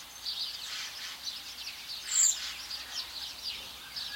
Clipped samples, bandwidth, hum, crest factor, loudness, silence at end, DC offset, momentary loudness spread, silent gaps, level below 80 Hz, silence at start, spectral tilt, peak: under 0.1%; 16.5 kHz; none; 24 dB; -33 LUFS; 0 s; under 0.1%; 14 LU; none; -66 dBFS; 0 s; 2.5 dB/octave; -12 dBFS